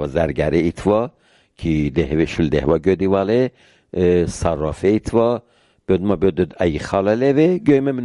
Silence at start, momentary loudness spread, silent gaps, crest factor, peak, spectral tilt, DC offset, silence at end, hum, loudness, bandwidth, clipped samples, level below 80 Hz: 0 s; 6 LU; none; 16 dB; -2 dBFS; -7.5 dB/octave; under 0.1%; 0 s; none; -18 LUFS; 11.5 kHz; under 0.1%; -36 dBFS